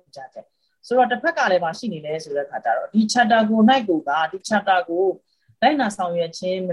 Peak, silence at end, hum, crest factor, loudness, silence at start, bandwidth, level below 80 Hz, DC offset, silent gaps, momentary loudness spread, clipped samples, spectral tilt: -4 dBFS; 0 s; none; 18 dB; -20 LUFS; 0.15 s; 11.5 kHz; -66 dBFS; under 0.1%; none; 12 LU; under 0.1%; -4.5 dB/octave